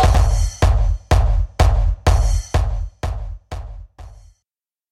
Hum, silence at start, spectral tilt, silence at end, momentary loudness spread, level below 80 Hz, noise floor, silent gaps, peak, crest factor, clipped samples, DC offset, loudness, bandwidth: none; 0 s; -5.5 dB/octave; 0.8 s; 16 LU; -18 dBFS; -86 dBFS; none; -2 dBFS; 16 dB; under 0.1%; under 0.1%; -19 LUFS; 12.5 kHz